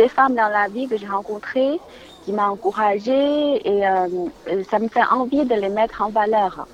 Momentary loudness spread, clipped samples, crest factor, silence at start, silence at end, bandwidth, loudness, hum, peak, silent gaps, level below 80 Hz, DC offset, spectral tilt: 8 LU; under 0.1%; 16 dB; 0 s; 0.1 s; 10.5 kHz; -20 LUFS; none; -2 dBFS; none; -54 dBFS; under 0.1%; -6 dB/octave